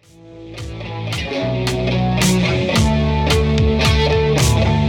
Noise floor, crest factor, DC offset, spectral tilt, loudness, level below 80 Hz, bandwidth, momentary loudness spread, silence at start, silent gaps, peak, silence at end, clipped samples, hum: -38 dBFS; 14 dB; under 0.1%; -5.5 dB/octave; -16 LUFS; -24 dBFS; 18 kHz; 13 LU; 0.25 s; none; -4 dBFS; 0 s; under 0.1%; none